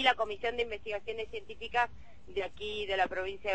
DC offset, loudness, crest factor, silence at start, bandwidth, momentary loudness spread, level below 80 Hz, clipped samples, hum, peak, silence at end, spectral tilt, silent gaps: 0.5%; -35 LUFS; 22 dB; 0 s; 8.4 kHz; 8 LU; -56 dBFS; under 0.1%; none; -12 dBFS; 0 s; -3.5 dB/octave; none